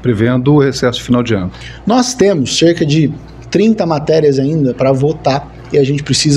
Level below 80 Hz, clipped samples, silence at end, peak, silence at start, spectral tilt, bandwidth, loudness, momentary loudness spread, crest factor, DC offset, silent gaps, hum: -38 dBFS; under 0.1%; 0 s; 0 dBFS; 0 s; -5.5 dB/octave; 12 kHz; -13 LUFS; 7 LU; 12 dB; under 0.1%; none; none